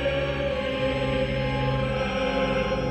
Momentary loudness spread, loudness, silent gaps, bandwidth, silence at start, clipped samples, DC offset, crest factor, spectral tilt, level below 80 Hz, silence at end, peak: 2 LU; -26 LUFS; none; 9 kHz; 0 s; under 0.1%; under 0.1%; 12 dB; -6.5 dB/octave; -36 dBFS; 0 s; -14 dBFS